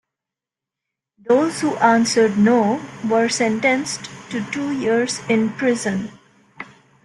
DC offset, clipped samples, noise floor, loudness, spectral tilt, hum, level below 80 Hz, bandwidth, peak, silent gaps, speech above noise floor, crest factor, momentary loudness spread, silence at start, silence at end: under 0.1%; under 0.1%; -87 dBFS; -19 LUFS; -4.5 dB/octave; none; -62 dBFS; 12 kHz; -2 dBFS; none; 69 dB; 18 dB; 16 LU; 1.25 s; 0.4 s